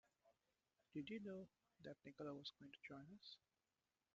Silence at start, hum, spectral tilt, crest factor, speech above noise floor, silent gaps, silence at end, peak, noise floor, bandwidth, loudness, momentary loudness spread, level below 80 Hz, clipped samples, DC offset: 0.25 s; none; -4 dB/octave; 18 dB; over 34 dB; none; 0.8 s; -40 dBFS; under -90 dBFS; 7.4 kHz; -57 LUFS; 10 LU; -90 dBFS; under 0.1%; under 0.1%